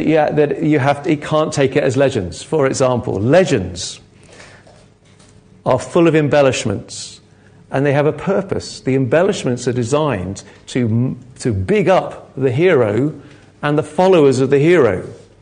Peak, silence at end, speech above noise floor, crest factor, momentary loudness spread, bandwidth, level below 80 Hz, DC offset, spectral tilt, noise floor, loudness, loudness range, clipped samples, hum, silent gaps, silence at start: 0 dBFS; 0.25 s; 32 dB; 16 dB; 12 LU; 10 kHz; -44 dBFS; under 0.1%; -6 dB/octave; -47 dBFS; -16 LUFS; 4 LU; under 0.1%; none; none; 0 s